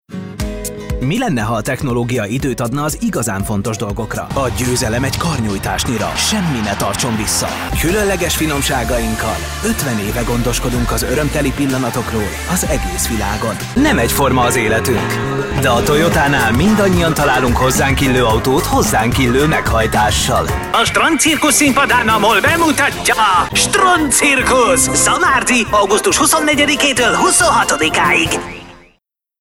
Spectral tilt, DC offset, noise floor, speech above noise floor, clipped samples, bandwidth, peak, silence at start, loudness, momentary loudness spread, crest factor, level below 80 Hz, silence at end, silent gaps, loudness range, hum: -3.5 dB/octave; under 0.1%; -61 dBFS; 47 dB; under 0.1%; 16.5 kHz; -2 dBFS; 0.1 s; -14 LUFS; 8 LU; 12 dB; -28 dBFS; 0.65 s; none; 7 LU; none